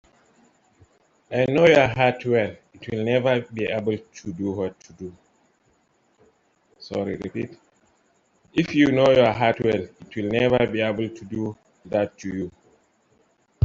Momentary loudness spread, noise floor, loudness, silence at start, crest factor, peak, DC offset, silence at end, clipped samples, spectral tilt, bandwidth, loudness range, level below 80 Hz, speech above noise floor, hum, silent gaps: 16 LU; -65 dBFS; -22 LUFS; 1.3 s; 22 dB; -2 dBFS; under 0.1%; 1.15 s; under 0.1%; -6.5 dB/octave; 7.6 kHz; 13 LU; -56 dBFS; 43 dB; none; none